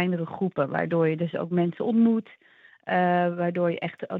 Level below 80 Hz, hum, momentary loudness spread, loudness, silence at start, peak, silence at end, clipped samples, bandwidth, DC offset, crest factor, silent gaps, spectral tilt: -76 dBFS; none; 7 LU; -25 LUFS; 0 s; -10 dBFS; 0 s; under 0.1%; 4.3 kHz; under 0.1%; 16 dB; none; -10 dB/octave